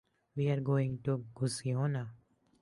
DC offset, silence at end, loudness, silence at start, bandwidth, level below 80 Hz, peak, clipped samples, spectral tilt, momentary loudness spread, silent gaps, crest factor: under 0.1%; 0.45 s; -34 LUFS; 0.35 s; 11.5 kHz; -68 dBFS; -20 dBFS; under 0.1%; -7 dB/octave; 9 LU; none; 16 dB